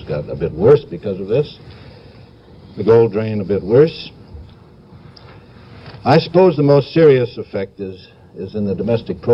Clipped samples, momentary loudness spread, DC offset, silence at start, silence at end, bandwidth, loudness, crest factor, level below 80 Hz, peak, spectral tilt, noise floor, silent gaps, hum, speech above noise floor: under 0.1%; 18 LU; under 0.1%; 0 s; 0 s; 5.8 kHz; -15 LUFS; 16 dB; -46 dBFS; 0 dBFS; -9 dB/octave; -42 dBFS; none; none; 27 dB